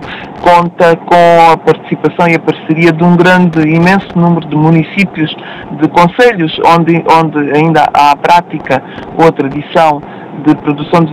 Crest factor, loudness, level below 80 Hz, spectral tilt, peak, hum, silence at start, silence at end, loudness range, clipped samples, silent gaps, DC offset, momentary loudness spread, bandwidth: 8 dB; -8 LUFS; -42 dBFS; -7 dB/octave; 0 dBFS; none; 0 s; 0 s; 2 LU; 3%; none; under 0.1%; 9 LU; 12.5 kHz